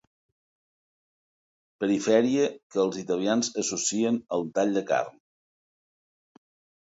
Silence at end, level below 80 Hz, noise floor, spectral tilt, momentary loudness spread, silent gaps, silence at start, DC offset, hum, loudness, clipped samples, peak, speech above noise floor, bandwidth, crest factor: 1.75 s; -74 dBFS; under -90 dBFS; -4 dB/octave; 6 LU; 2.63-2.70 s; 1.8 s; under 0.1%; none; -26 LUFS; under 0.1%; -8 dBFS; over 64 dB; 8 kHz; 20 dB